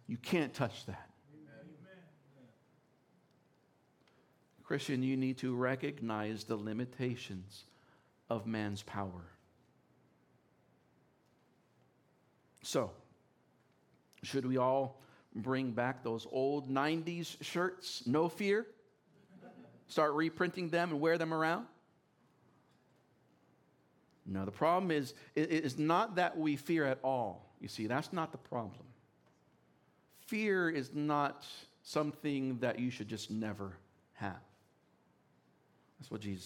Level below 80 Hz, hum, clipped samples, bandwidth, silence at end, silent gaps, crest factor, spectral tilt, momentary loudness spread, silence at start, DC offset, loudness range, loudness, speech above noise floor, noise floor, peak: -82 dBFS; none; under 0.1%; 17.5 kHz; 0 s; none; 22 dB; -6 dB/octave; 16 LU; 0.1 s; under 0.1%; 11 LU; -37 LUFS; 36 dB; -72 dBFS; -18 dBFS